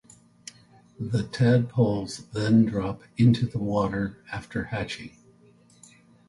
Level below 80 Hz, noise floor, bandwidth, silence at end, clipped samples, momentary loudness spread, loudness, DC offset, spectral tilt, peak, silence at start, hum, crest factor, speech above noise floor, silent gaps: -52 dBFS; -57 dBFS; 11.5 kHz; 1.2 s; under 0.1%; 19 LU; -25 LUFS; under 0.1%; -7.5 dB/octave; -8 dBFS; 1 s; none; 18 dB; 32 dB; none